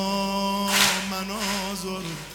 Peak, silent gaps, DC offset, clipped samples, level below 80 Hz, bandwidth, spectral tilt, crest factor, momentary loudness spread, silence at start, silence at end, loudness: -2 dBFS; none; under 0.1%; under 0.1%; -50 dBFS; 19 kHz; -2.5 dB/octave; 24 dB; 11 LU; 0 s; 0 s; -24 LUFS